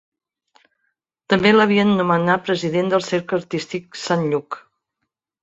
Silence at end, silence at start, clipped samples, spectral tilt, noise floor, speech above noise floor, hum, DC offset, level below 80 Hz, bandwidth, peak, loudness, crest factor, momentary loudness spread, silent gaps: 0.85 s; 1.3 s; under 0.1%; -5.5 dB/octave; -78 dBFS; 60 dB; none; under 0.1%; -60 dBFS; 8 kHz; -2 dBFS; -19 LUFS; 18 dB; 13 LU; none